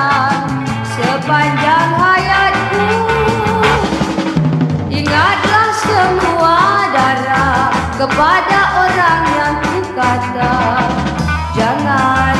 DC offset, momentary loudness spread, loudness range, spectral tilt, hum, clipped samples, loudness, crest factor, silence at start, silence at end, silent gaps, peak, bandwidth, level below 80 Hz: under 0.1%; 5 LU; 2 LU; -5.5 dB/octave; none; under 0.1%; -12 LUFS; 12 dB; 0 s; 0 s; none; 0 dBFS; 14 kHz; -32 dBFS